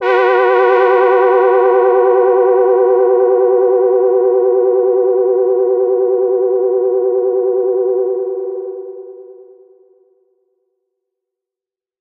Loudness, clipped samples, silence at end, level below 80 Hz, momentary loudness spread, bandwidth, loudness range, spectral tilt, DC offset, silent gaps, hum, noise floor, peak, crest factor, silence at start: -12 LUFS; under 0.1%; 2.6 s; -84 dBFS; 8 LU; 4.6 kHz; 11 LU; -6 dB/octave; under 0.1%; none; none; -88 dBFS; 0 dBFS; 12 dB; 0 s